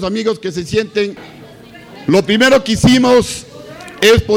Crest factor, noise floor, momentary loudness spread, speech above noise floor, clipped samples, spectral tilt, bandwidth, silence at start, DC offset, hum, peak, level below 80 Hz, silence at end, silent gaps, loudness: 12 dB; -37 dBFS; 20 LU; 24 dB; under 0.1%; -4.5 dB/octave; 18 kHz; 0 s; under 0.1%; none; -2 dBFS; -36 dBFS; 0 s; none; -13 LUFS